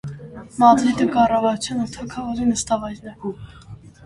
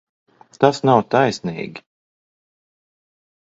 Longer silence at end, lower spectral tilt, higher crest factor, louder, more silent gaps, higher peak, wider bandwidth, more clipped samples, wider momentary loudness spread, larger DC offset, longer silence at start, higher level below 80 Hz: second, 0.15 s vs 1.75 s; about the same, -5 dB/octave vs -6 dB/octave; about the same, 20 dB vs 22 dB; about the same, -19 LUFS vs -18 LUFS; neither; about the same, -2 dBFS vs 0 dBFS; first, 11.5 kHz vs 7.8 kHz; neither; first, 20 LU vs 15 LU; neither; second, 0.05 s vs 0.6 s; first, -48 dBFS vs -62 dBFS